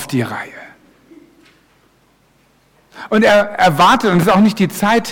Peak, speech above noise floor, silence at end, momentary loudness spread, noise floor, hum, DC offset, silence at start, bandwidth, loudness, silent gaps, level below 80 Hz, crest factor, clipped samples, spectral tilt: -4 dBFS; 42 dB; 0 s; 15 LU; -55 dBFS; none; under 0.1%; 0 s; 18 kHz; -13 LUFS; none; -48 dBFS; 12 dB; under 0.1%; -5.5 dB/octave